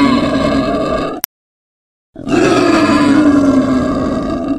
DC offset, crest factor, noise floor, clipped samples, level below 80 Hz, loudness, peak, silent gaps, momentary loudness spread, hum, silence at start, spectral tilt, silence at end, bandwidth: under 0.1%; 12 dB; under -90 dBFS; under 0.1%; -34 dBFS; -12 LUFS; 0 dBFS; 1.25-2.13 s; 9 LU; none; 0 s; -5.5 dB/octave; 0 s; 16 kHz